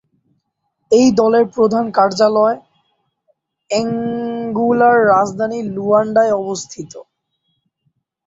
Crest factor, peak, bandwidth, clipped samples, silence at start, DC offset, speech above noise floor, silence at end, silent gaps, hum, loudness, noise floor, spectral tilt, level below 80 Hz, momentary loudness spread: 16 dB; -2 dBFS; 8 kHz; under 0.1%; 0.9 s; under 0.1%; 56 dB; 1.25 s; none; none; -15 LUFS; -70 dBFS; -5 dB/octave; -58 dBFS; 12 LU